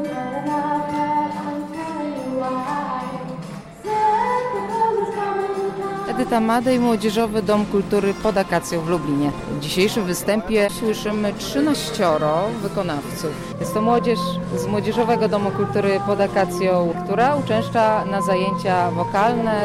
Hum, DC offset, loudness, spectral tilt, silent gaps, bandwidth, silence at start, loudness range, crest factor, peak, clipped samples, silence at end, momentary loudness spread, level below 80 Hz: none; under 0.1%; -21 LUFS; -5.5 dB/octave; none; 16 kHz; 0 s; 4 LU; 14 dB; -6 dBFS; under 0.1%; 0 s; 8 LU; -46 dBFS